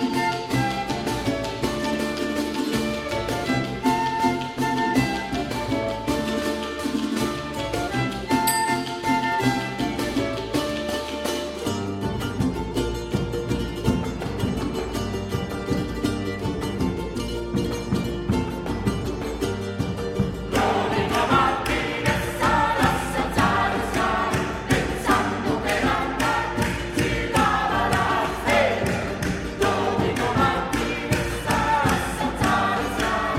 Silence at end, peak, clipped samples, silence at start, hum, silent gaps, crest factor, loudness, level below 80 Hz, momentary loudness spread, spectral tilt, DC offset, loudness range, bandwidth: 0 s; -6 dBFS; under 0.1%; 0 s; none; none; 18 dB; -24 LUFS; -38 dBFS; 7 LU; -5 dB/octave; under 0.1%; 5 LU; 16.5 kHz